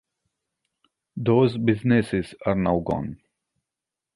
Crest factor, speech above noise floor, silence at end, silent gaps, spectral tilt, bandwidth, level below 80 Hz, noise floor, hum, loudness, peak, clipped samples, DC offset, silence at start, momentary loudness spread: 18 dB; 66 dB; 1 s; none; -8.5 dB/octave; 11.5 kHz; -50 dBFS; -87 dBFS; none; -23 LUFS; -6 dBFS; under 0.1%; under 0.1%; 1.15 s; 9 LU